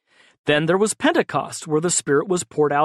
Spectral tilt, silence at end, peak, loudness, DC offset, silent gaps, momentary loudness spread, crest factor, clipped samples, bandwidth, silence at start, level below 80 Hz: -4 dB/octave; 0 s; -4 dBFS; -20 LUFS; under 0.1%; none; 6 LU; 16 dB; under 0.1%; 13 kHz; 0.45 s; -62 dBFS